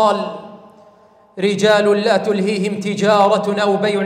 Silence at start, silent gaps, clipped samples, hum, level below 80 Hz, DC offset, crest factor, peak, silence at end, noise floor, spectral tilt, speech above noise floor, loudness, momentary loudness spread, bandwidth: 0 s; none; under 0.1%; none; -64 dBFS; under 0.1%; 14 dB; -4 dBFS; 0 s; -49 dBFS; -5 dB/octave; 33 dB; -16 LUFS; 8 LU; 13.5 kHz